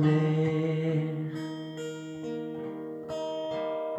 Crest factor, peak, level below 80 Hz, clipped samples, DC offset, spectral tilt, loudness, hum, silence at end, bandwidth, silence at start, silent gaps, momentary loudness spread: 16 dB; -14 dBFS; -70 dBFS; under 0.1%; under 0.1%; -8 dB/octave; -32 LUFS; none; 0 s; 8.4 kHz; 0 s; none; 11 LU